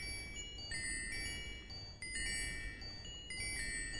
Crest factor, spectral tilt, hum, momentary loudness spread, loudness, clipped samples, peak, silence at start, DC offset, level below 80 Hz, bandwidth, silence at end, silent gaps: 16 dB; -1.5 dB/octave; none; 8 LU; -42 LUFS; under 0.1%; -28 dBFS; 0 s; 0.1%; -52 dBFS; 11.5 kHz; 0 s; none